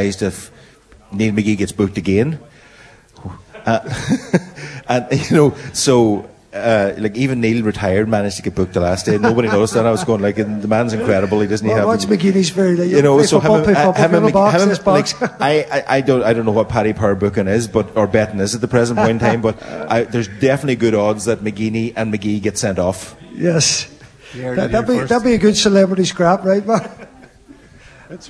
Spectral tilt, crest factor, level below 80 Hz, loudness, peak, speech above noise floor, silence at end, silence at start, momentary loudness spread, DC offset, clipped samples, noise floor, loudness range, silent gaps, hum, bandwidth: -5.5 dB/octave; 16 dB; -44 dBFS; -16 LUFS; 0 dBFS; 30 dB; 0 s; 0 s; 9 LU; under 0.1%; under 0.1%; -45 dBFS; 6 LU; none; none; 11 kHz